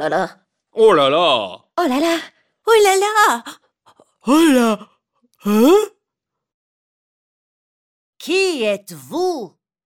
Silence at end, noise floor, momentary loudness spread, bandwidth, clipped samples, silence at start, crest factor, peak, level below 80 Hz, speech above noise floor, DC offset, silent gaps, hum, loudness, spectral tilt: 0.4 s; -82 dBFS; 16 LU; 17 kHz; under 0.1%; 0 s; 16 dB; -2 dBFS; -62 dBFS; 66 dB; under 0.1%; 6.54-8.13 s; none; -16 LUFS; -3.5 dB/octave